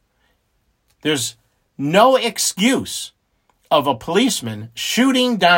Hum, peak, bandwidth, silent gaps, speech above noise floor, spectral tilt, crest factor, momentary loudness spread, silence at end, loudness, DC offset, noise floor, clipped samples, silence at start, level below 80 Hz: none; 0 dBFS; 16.5 kHz; none; 49 dB; -3.5 dB/octave; 18 dB; 13 LU; 0 s; -18 LUFS; under 0.1%; -66 dBFS; under 0.1%; 1.05 s; -60 dBFS